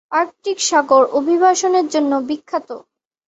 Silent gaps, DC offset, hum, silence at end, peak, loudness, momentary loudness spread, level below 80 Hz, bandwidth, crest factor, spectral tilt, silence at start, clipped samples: none; under 0.1%; none; 0.5 s; 0 dBFS; -16 LUFS; 12 LU; -66 dBFS; 8.2 kHz; 16 dB; -1.5 dB/octave; 0.1 s; under 0.1%